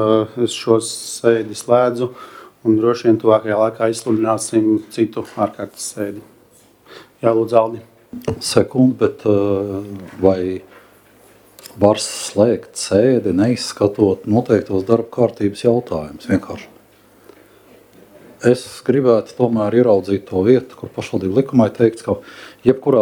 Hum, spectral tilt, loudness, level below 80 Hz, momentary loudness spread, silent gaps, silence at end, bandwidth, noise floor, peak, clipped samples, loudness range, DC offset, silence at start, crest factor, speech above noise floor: none; -6 dB/octave; -17 LUFS; -54 dBFS; 11 LU; none; 0 s; 17 kHz; -50 dBFS; 0 dBFS; under 0.1%; 5 LU; under 0.1%; 0 s; 18 dB; 34 dB